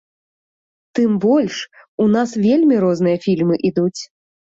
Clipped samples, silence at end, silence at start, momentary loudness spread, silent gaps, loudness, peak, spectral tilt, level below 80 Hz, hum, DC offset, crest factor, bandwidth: under 0.1%; 0.55 s; 0.95 s; 13 LU; 1.88-1.98 s; -17 LUFS; -4 dBFS; -7 dB/octave; -58 dBFS; none; under 0.1%; 14 dB; 7.8 kHz